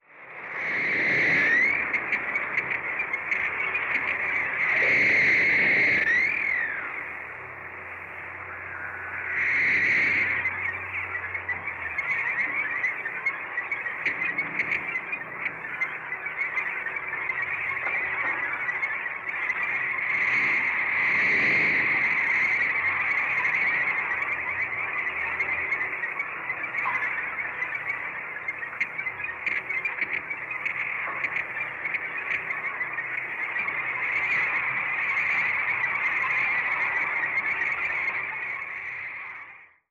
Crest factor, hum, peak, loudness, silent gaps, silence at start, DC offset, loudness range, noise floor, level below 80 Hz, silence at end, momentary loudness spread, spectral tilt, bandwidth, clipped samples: 14 dB; none; -14 dBFS; -25 LUFS; none; 0.1 s; under 0.1%; 7 LU; -47 dBFS; -66 dBFS; 0.25 s; 11 LU; -4 dB/octave; 7.4 kHz; under 0.1%